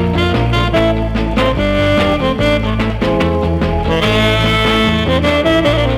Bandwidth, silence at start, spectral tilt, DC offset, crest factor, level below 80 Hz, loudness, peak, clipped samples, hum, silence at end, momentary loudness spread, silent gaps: 15.5 kHz; 0 s; -6.5 dB/octave; under 0.1%; 12 dB; -22 dBFS; -13 LUFS; 0 dBFS; under 0.1%; none; 0 s; 3 LU; none